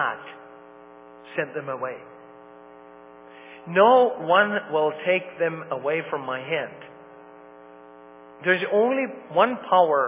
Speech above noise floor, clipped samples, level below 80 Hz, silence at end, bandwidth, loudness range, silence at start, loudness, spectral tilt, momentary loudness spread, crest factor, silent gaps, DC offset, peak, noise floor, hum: 24 dB; under 0.1%; -76 dBFS; 0 s; 3.8 kHz; 11 LU; 0 s; -23 LUFS; -8.5 dB/octave; 19 LU; 20 dB; none; under 0.1%; -4 dBFS; -47 dBFS; none